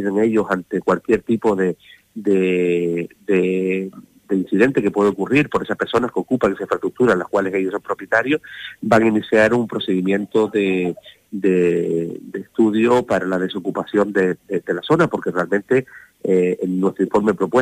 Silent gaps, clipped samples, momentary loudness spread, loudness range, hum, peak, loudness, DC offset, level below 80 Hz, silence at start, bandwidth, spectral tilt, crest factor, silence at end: none; under 0.1%; 8 LU; 2 LU; none; -2 dBFS; -19 LUFS; under 0.1%; -54 dBFS; 0 s; 15 kHz; -7 dB/octave; 16 dB; 0 s